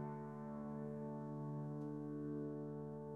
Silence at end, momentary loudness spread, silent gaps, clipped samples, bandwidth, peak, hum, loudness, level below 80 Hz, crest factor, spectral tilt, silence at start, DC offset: 0 s; 3 LU; none; under 0.1%; 3.6 kHz; -34 dBFS; none; -47 LUFS; -78 dBFS; 12 dB; -10.5 dB/octave; 0 s; under 0.1%